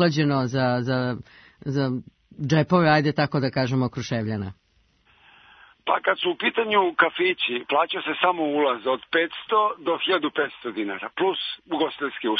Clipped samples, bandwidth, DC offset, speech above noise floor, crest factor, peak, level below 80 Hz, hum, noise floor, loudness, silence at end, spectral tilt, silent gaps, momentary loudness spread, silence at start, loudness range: under 0.1%; 6.6 kHz; under 0.1%; 41 dB; 20 dB; -4 dBFS; -62 dBFS; none; -64 dBFS; -23 LUFS; 0 s; -6.5 dB/octave; none; 9 LU; 0 s; 4 LU